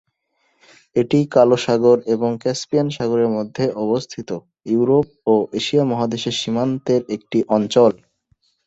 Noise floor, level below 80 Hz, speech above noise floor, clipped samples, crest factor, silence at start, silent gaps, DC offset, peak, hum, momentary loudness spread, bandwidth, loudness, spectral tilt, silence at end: -67 dBFS; -58 dBFS; 49 dB; under 0.1%; 18 dB; 0.95 s; none; under 0.1%; -2 dBFS; none; 8 LU; 8.2 kHz; -18 LUFS; -6 dB/octave; 0.7 s